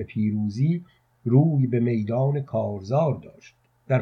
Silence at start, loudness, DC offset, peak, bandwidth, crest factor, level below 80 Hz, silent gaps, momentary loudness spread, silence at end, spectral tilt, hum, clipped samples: 0 s; -24 LUFS; under 0.1%; -6 dBFS; 6.4 kHz; 18 dB; -64 dBFS; none; 8 LU; 0 s; -10 dB/octave; none; under 0.1%